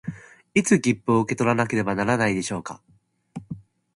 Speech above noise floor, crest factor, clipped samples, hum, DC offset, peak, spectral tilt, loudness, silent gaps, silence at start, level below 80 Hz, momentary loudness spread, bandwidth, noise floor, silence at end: 21 dB; 18 dB; under 0.1%; none; under 0.1%; -6 dBFS; -5.5 dB/octave; -22 LUFS; none; 0.05 s; -56 dBFS; 20 LU; 11.5 kHz; -42 dBFS; 0.35 s